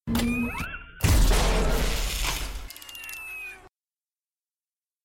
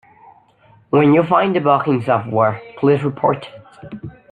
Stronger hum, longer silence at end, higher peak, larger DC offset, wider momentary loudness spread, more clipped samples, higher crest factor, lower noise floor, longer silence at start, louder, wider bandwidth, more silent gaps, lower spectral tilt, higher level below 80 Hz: neither; first, 1.35 s vs 0.25 s; second, -10 dBFS vs -2 dBFS; neither; second, 16 LU vs 21 LU; neither; about the same, 18 dB vs 16 dB; first, under -90 dBFS vs -51 dBFS; second, 0.05 s vs 0.95 s; second, -27 LUFS vs -16 LUFS; first, 17 kHz vs 8.8 kHz; neither; second, -4 dB/octave vs -9 dB/octave; first, -30 dBFS vs -58 dBFS